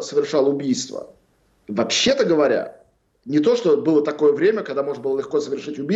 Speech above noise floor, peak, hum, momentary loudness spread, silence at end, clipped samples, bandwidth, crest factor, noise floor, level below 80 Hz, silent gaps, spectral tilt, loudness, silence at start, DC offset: 40 dB; -8 dBFS; none; 10 LU; 0 s; under 0.1%; 8 kHz; 12 dB; -59 dBFS; -62 dBFS; none; -4 dB/octave; -20 LUFS; 0 s; under 0.1%